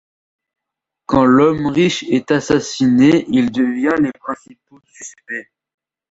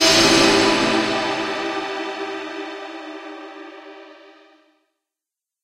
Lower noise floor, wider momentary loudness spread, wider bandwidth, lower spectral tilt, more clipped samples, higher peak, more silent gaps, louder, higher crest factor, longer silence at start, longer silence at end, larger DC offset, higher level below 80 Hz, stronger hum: second, -82 dBFS vs -87 dBFS; second, 18 LU vs 24 LU; second, 8 kHz vs 16 kHz; first, -5.5 dB/octave vs -2.5 dB/octave; neither; about the same, -2 dBFS vs -2 dBFS; neither; first, -15 LUFS vs -18 LUFS; about the same, 16 dB vs 20 dB; first, 1.1 s vs 0 s; second, 0.7 s vs 1.5 s; neither; about the same, -48 dBFS vs -48 dBFS; neither